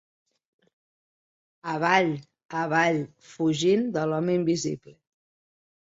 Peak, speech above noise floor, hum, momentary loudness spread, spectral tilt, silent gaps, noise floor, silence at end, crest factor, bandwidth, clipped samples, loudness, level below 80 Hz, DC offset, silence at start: -8 dBFS; over 65 dB; none; 14 LU; -5.5 dB/octave; 2.45-2.49 s; under -90 dBFS; 1.15 s; 20 dB; 8 kHz; under 0.1%; -25 LUFS; -68 dBFS; under 0.1%; 1.65 s